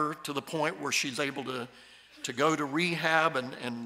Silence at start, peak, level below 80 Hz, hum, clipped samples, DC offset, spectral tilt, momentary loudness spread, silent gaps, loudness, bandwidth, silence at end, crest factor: 0 s; -10 dBFS; -76 dBFS; none; under 0.1%; under 0.1%; -3.5 dB/octave; 12 LU; none; -30 LUFS; 16 kHz; 0 s; 22 dB